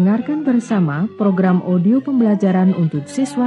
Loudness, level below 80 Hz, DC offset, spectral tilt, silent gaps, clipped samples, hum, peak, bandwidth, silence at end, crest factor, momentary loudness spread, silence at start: -16 LUFS; -66 dBFS; under 0.1%; -8.5 dB/octave; none; under 0.1%; none; -4 dBFS; 11 kHz; 0 s; 12 dB; 5 LU; 0 s